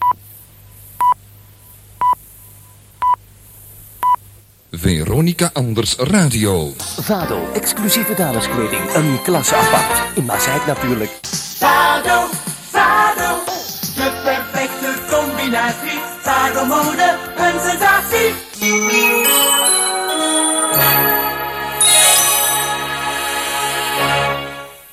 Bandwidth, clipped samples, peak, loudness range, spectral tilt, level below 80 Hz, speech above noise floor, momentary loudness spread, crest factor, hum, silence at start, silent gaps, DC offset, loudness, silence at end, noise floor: 16.5 kHz; under 0.1%; 0 dBFS; 8 LU; -2.5 dB/octave; -42 dBFS; 28 dB; 10 LU; 16 dB; none; 0 s; none; under 0.1%; -15 LUFS; 0.1 s; -44 dBFS